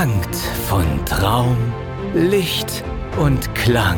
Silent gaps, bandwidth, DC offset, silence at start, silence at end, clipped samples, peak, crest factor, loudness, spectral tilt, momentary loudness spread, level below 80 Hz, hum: none; over 20 kHz; under 0.1%; 0 s; 0 s; under 0.1%; -4 dBFS; 14 dB; -19 LUFS; -5.5 dB/octave; 8 LU; -28 dBFS; none